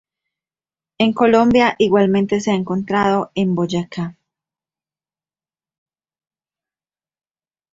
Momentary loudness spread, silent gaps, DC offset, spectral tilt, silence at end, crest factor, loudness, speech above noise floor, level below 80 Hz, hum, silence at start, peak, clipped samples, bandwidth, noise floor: 9 LU; none; under 0.1%; -6.5 dB/octave; 3.6 s; 18 dB; -17 LUFS; over 74 dB; -54 dBFS; none; 1 s; -2 dBFS; under 0.1%; 7.8 kHz; under -90 dBFS